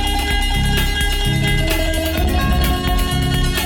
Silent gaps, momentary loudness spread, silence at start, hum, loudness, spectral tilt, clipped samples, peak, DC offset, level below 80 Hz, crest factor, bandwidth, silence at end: none; 1 LU; 0 s; none; -18 LUFS; -4.5 dB/octave; under 0.1%; -4 dBFS; under 0.1%; -20 dBFS; 14 dB; 20 kHz; 0 s